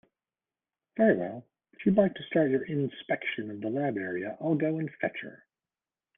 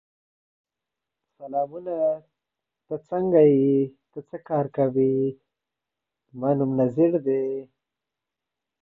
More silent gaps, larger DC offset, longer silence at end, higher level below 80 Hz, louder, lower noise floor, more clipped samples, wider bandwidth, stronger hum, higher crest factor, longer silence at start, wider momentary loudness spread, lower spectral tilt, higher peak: neither; neither; second, 0.8 s vs 1.15 s; about the same, -68 dBFS vs -66 dBFS; second, -29 LUFS vs -23 LUFS; about the same, under -90 dBFS vs -87 dBFS; neither; about the same, 3.8 kHz vs 3.8 kHz; neither; about the same, 22 dB vs 18 dB; second, 0.95 s vs 1.4 s; second, 11 LU vs 17 LU; second, -10.5 dB/octave vs -12 dB/octave; second, -10 dBFS vs -6 dBFS